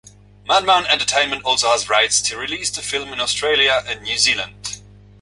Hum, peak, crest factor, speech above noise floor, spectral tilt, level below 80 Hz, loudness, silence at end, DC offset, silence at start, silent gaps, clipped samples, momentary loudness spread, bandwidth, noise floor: 50 Hz at -45 dBFS; -2 dBFS; 18 dB; 20 dB; 0 dB/octave; -50 dBFS; -17 LUFS; 0.4 s; under 0.1%; 0.45 s; none; under 0.1%; 10 LU; 11.5 kHz; -38 dBFS